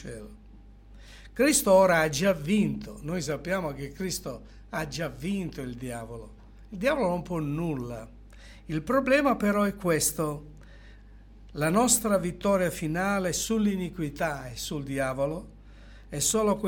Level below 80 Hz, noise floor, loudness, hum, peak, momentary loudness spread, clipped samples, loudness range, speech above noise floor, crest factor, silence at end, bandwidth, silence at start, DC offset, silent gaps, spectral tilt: -48 dBFS; -50 dBFS; -27 LUFS; none; -8 dBFS; 16 LU; under 0.1%; 7 LU; 23 dB; 20 dB; 0 s; 17.5 kHz; 0 s; under 0.1%; none; -4.5 dB/octave